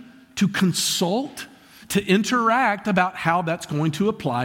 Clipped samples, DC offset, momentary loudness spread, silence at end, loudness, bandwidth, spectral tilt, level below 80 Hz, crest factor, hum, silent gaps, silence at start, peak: under 0.1%; under 0.1%; 8 LU; 0 s; -21 LUFS; 17 kHz; -4.5 dB/octave; -58 dBFS; 16 dB; none; none; 0 s; -6 dBFS